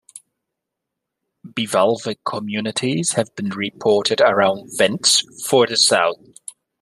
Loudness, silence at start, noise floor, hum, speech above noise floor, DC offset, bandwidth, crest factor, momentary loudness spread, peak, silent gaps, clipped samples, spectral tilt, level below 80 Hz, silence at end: -18 LUFS; 0.15 s; -81 dBFS; none; 63 dB; under 0.1%; 13.5 kHz; 18 dB; 12 LU; 0 dBFS; none; under 0.1%; -2.5 dB/octave; -66 dBFS; 0.65 s